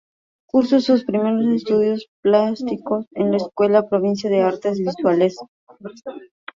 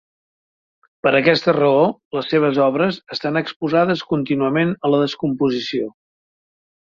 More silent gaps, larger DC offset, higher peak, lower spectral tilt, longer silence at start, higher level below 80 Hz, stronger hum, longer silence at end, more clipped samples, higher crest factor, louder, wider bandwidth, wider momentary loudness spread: first, 2.08-2.23 s, 5.48-5.67 s vs 2.05-2.11 s, 3.56-3.60 s; neither; about the same, -2 dBFS vs -2 dBFS; about the same, -7 dB/octave vs -7 dB/octave; second, 0.55 s vs 1.05 s; about the same, -64 dBFS vs -60 dBFS; neither; second, 0.35 s vs 1 s; neither; about the same, 16 dB vs 18 dB; about the same, -19 LUFS vs -18 LUFS; about the same, 7.4 kHz vs 7.2 kHz; first, 18 LU vs 7 LU